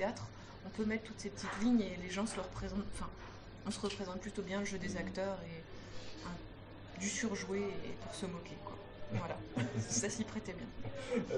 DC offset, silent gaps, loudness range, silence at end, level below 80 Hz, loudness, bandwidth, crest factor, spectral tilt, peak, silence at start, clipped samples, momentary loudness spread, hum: under 0.1%; none; 3 LU; 0 s; -56 dBFS; -41 LUFS; 11 kHz; 18 dB; -4.5 dB/octave; -22 dBFS; 0 s; under 0.1%; 14 LU; none